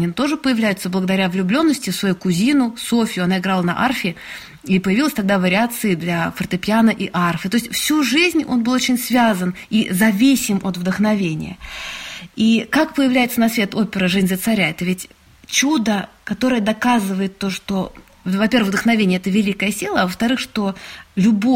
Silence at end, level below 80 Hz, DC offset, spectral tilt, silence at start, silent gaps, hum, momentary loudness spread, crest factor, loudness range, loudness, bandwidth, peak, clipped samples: 0 s; -50 dBFS; under 0.1%; -4.5 dB/octave; 0 s; none; none; 8 LU; 16 dB; 2 LU; -18 LUFS; 16.5 kHz; -2 dBFS; under 0.1%